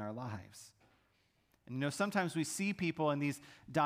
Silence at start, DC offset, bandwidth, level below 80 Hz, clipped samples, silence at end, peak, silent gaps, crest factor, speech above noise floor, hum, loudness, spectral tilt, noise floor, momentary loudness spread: 0 s; under 0.1%; 15.5 kHz; -74 dBFS; under 0.1%; 0 s; -20 dBFS; none; 18 dB; 39 dB; none; -37 LUFS; -5 dB/octave; -75 dBFS; 14 LU